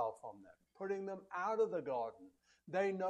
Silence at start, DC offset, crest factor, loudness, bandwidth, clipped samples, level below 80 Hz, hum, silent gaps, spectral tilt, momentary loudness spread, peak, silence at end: 0 s; under 0.1%; 16 dB; -41 LUFS; 9.8 kHz; under 0.1%; -84 dBFS; none; none; -6.5 dB/octave; 15 LU; -24 dBFS; 0 s